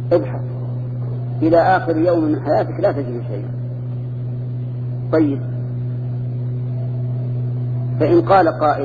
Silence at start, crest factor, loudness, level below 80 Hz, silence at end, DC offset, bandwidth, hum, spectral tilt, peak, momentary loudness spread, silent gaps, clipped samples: 0 s; 16 dB; -19 LUFS; -48 dBFS; 0 s; under 0.1%; 4.9 kHz; none; -10.5 dB/octave; -2 dBFS; 11 LU; none; under 0.1%